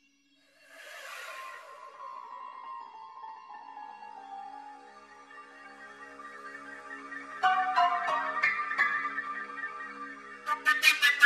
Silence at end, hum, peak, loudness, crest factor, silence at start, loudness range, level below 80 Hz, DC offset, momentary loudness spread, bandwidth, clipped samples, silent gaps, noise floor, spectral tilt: 0 s; none; -8 dBFS; -29 LUFS; 26 dB; 0.7 s; 17 LU; -82 dBFS; under 0.1%; 22 LU; 14 kHz; under 0.1%; none; -67 dBFS; 0.5 dB/octave